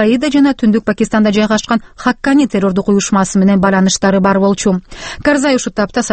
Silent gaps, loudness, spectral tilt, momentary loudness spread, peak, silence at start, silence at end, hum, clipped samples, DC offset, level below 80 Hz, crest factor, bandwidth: none; -12 LUFS; -5 dB/octave; 5 LU; 0 dBFS; 0 s; 0 s; none; under 0.1%; under 0.1%; -40 dBFS; 12 dB; 8.8 kHz